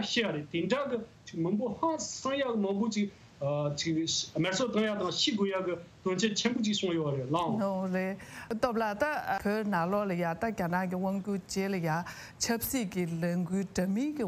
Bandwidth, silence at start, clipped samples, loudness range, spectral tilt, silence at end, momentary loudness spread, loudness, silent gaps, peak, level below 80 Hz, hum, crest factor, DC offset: 15.5 kHz; 0 s; under 0.1%; 2 LU; -4.5 dB/octave; 0 s; 5 LU; -31 LUFS; none; -14 dBFS; -62 dBFS; none; 16 dB; under 0.1%